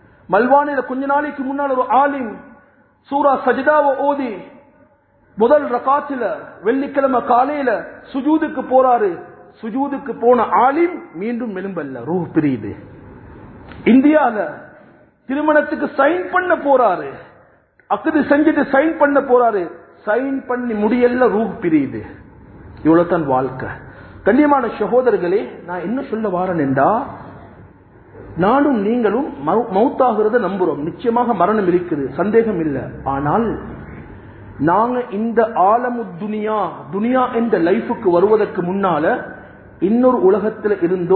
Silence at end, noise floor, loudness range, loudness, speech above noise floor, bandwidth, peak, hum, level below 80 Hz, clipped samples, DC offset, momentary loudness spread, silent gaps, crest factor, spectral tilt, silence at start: 0 s; -54 dBFS; 3 LU; -17 LUFS; 38 dB; 4.5 kHz; 0 dBFS; none; -48 dBFS; under 0.1%; under 0.1%; 12 LU; none; 16 dB; -12 dB/octave; 0.3 s